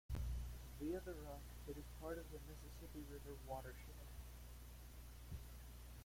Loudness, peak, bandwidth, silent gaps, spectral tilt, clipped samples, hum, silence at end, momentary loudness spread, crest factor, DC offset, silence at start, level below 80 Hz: -53 LUFS; -34 dBFS; 16.5 kHz; none; -6 dB/octave; under 0.1%; 60 Hz at -55 dBFS; 0 s; 10 LU; 16 dB; under 0.1%; 0.1 s; -54 dBFS